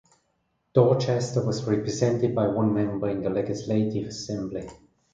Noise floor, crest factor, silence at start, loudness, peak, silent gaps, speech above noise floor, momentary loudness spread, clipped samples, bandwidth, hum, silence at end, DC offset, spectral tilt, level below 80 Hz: -73 dBFS; 18 dB; 0.75 s; -25 LUFS; -6 dBFS; none; 48 dB; 10 LU; under 0.1%; 9.2 kHz; none; 0.4 s; under 0.1%; -7 dB/octave; -56 dBFS